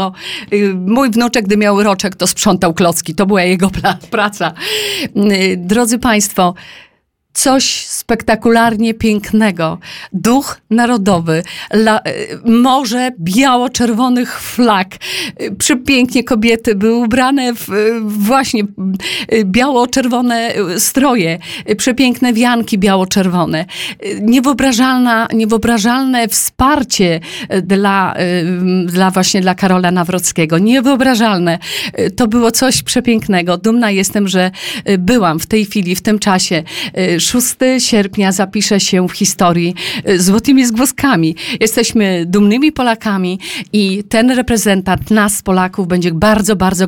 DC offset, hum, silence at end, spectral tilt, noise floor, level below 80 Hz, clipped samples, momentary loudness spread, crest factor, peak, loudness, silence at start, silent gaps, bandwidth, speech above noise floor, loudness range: under 0.1%; none; 0 s; -4 dB/octave; -55 dBFS; -40 dBFS; under 0.1%; 6 LU; 12 dB; 0 dBFS; -12 LUFS; 0 s; none; 18 kHz; 43 dB; 2 LU